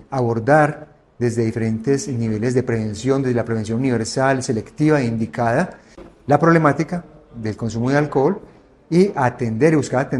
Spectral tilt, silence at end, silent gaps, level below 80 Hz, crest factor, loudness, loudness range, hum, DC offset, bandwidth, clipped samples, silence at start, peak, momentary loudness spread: -7 dB/octave; 0 s; none; -50 dBFS; 18 dB; -19 LUFS; 2 LU; none; under 0.1%; 11.5 kHz; under 0.1%; 0.1 s; 0 dBFS; 9 LU